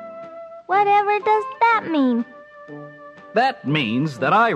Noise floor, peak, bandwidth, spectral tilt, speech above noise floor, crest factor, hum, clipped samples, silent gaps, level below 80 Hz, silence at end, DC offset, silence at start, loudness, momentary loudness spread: -41 dBFS; -6 dBFS; 9.4 kHz; -6.5 dB/octave; 23 dB; 14 dB; none; under 0.1%; none; -70 dBFS; 0 s; under 0.1%; 0 s; -19 LUFS; 21 LU